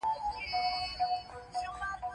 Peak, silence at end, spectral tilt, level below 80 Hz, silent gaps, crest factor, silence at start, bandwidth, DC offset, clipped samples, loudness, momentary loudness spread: -22 dBFS; 0 s; -2.5 dB/octave; -56 dBFS; none; 12 dB; 0 s; 11 kHz; under 0.1%; under 0.1%; -35 LUFS; 7 LU